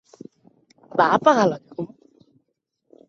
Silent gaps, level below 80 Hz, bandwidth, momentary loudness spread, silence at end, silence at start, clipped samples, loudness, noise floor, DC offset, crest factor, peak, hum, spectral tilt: none; -68 dBFS; 7.4 kHz; 18 LU; 1.2 s; 0.95 s; under 0.1%; -19 LUFS; -75 dBFS; under 0.1%; 22 dB; -2 dBFS; none; -5.5 dB/octave